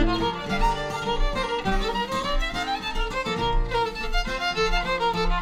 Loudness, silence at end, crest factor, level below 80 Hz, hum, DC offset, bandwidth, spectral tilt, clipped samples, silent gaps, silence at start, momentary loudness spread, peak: -26 LUFS; 0 s; 14 dB; -28 dBFS; none; under 0.1%; 13.5 kHz; -4.5 dB/octave; under 0.1%; none; 0 s; 4 LU; -10 dBFS